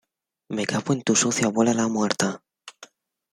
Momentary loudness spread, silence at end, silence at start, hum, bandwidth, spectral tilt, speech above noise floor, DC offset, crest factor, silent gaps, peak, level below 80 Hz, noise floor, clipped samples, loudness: 17 LU; 0.5 s; 0.5 s; none; 14 kHz; -4 dB/octave; 29 dB; under 0.1%; 22 dB; none; -4 dBFS; -66 dBFS; -51 dBFS; under 0.1%; -23 LUFS